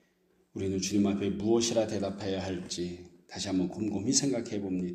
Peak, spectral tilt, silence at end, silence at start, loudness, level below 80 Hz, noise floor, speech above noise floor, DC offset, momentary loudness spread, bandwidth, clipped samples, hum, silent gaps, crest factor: -10 dBFS; -4.5 dB/octave; 0 s; 0.55 s; -31 LUFS; -64 dBFS; -69 dBFS; 39 dB; under 0.1%; 11 LU; 14.5 kHz; under 0.1%; none; none; 20 dB